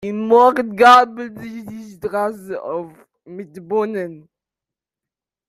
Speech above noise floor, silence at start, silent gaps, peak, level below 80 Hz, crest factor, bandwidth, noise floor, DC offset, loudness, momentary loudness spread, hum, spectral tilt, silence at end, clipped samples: 71 dB; 0 s; none; 0 dBFS; -62 dBFS; 18 dB; 14.5 kHz; -88 dBFS; under 0.1%; -15 LUFS; 25 LU; none; -5 dB/octave; 1.3 s; under 0.1%